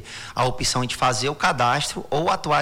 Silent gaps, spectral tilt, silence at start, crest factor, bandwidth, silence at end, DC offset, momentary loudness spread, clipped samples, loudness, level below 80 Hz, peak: none; -3.5 dB/octave; 0 s; 14 dB; 19 kHz; 0 s; under 0.1%; 4 LU; under 0.1%; -22 LUFS; -44 dBFS; -8 dBFS